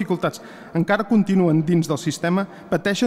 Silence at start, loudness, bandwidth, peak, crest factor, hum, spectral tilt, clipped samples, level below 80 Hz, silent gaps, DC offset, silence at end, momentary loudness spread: 0 s; -21 LUFS; 14.5 kHz; -8 dBFS; 12 dB; none; -6.5 dB/octave; under 0.1%; -60 dBFS; none; under 0.1%; 0 s; 8 LU